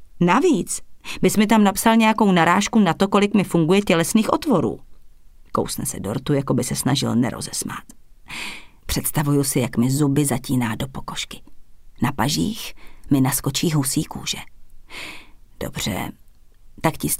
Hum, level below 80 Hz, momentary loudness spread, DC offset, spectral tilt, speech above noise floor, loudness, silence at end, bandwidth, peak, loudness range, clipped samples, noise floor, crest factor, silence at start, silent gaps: none; -44 dBFS; 16 LU; under 0.1%; -5 dB/octave; 25 dB; -20 LUFS; 0 s; 16 kHz; -2 dBFS; 7 LU; under 0.1%; -45 dBFS; 18 dB; 0 s; none